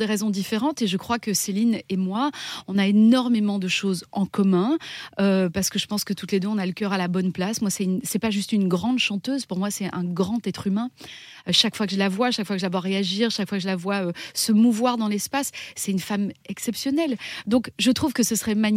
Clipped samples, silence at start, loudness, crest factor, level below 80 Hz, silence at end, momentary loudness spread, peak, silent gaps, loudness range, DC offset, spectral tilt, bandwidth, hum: under 0.1%; 0 s; -23 LUFS; 20 dB; -62 dBFS; 0 s; 8 LU; -4 dBFS; none; 3 LU; under 0.1%; -4.5 dB/octave; 16 kHz; none